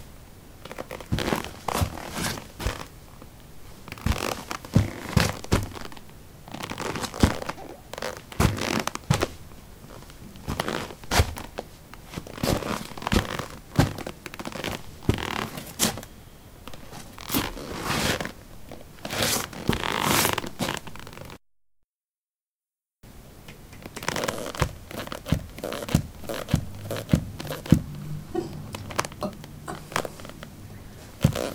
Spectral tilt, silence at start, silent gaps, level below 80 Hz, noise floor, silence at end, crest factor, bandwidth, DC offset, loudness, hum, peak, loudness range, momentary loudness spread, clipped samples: -4.5 dB/octave; 0 s; 21.89-22.00 s, 22.19-22.23 s, 22.42-22.59 s; -40 dBFS; under -90 dBFS; 0 s; 28 dB; 19 kHz; under 0.1%; -28 LUFS; none; 0 dBFS; 6 LU; 21 LU; under 0.1%